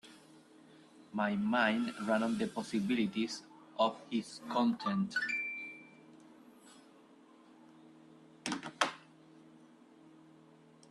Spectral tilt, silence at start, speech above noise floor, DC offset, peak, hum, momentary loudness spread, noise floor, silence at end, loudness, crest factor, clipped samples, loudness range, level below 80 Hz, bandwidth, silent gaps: -4.5 dB/octave; 0.05 s; 27 dB; under 0.1%; -14 dBFS; none; 14 LU; -61 dBFS; 1.25 s; -35 LUFS; 24 dB; under 0.1%; 9 LU; -78 dBFS; 12 kHz; none